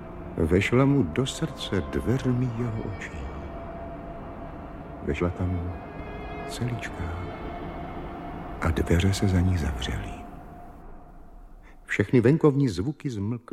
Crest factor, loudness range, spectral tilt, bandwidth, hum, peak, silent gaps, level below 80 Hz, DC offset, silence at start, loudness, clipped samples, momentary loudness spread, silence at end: 20 dB; 7 LU; -6.5 dB/octave; 14 kHz; none; -6 dBFS; none; -40 dBFS; under 0.1%; 0 s; -27 LUFS; under 0.1%; 18 LU; 0.1 s